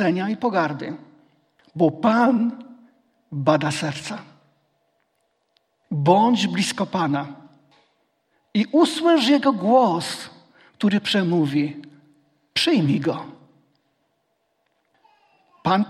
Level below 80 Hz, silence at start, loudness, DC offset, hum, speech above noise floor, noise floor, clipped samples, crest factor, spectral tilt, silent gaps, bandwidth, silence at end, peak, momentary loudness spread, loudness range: -68 dBFS; 0 s; -21 LUFS; under 0.1%; none; 51 dB; -71 dBFS; under 0.1%; 20 dB; -5.5 dB/octave; none; 14 kHz; 0 s; -2 dBFS; 17 LU; 6 LU